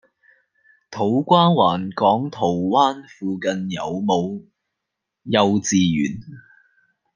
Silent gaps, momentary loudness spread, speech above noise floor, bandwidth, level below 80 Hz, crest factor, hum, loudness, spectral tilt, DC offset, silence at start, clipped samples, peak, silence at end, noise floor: none; 14 LU; 62 dB; 10 kHz; -62 dBFS; 20 dB; none; -20 LUFS; -5.5 dB/octave; under 0.1%; 0.9 s; under 0.1%; -2 dBFS; 0.75 s; -81 dBFS